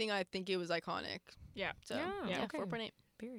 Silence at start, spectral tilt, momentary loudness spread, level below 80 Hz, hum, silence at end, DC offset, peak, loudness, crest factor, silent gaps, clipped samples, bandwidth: 0 s; -4.5 dB/octave; 10 LU; -68 dBFS; none; 0 s; under 0.1%; -22 dBFS; -41 LUFS; 18 dB; none; under 0.1%; 16 kHz